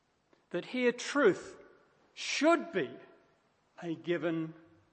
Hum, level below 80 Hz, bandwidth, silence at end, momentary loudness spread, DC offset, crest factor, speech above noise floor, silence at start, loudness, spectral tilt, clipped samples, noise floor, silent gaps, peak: none; -82 dBFS; 8.8 kHz; 0.4 s; 15 LU; under 0.1%; 20 dB; 39 dB; 0.55 s; -32 LUFS; -4.5 dB/octave; under 0.1%; -71 dBFS; none; -14 dBFS